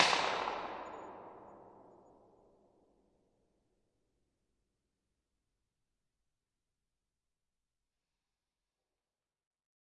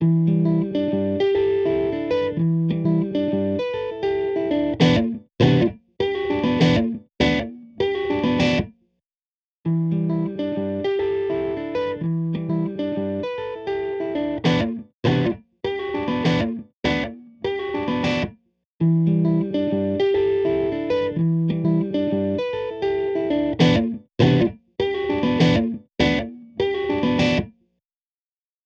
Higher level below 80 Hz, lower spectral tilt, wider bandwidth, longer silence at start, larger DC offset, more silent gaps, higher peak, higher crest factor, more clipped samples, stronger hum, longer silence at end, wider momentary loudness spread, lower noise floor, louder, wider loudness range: second, -78 dBFS vs -46 dBFS; second, -1.5 dB/octave vs -7.5 dB/octave; first, 9 kHz vs 7.2 kHz; about the same, 0 s vs 0 s; neither; second, none vs 9.15-9.64 s, 14.94-15.03 s, 16.74-16.83 s, 18.65-18.78 s; about the same, -6 dBFS vs -4 dBFS; first, 38 dB vs 18 dB; neither; neither; first, 8.2 s vs 1.15 s; first, 25 LU vs 8 LU; about the same, under -90 dBFS vs under -90 dBFS; second, -36 LUFS vs -22 LUFS; first, 24 LU vs 4 LU